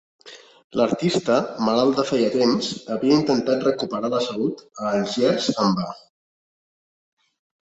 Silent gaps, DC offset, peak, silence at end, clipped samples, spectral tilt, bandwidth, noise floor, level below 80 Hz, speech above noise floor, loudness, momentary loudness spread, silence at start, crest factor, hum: 0.64-0.70 s; under 0.1%; -4 dBFS; 1.75 s; under 0.1%; -5.5 dB/octave; 8.2 kHz; under -90 dBFS; -62 dBFS; over 69 dB; -22 LUFS; 8 LU; 0.25 s; 18 dB; none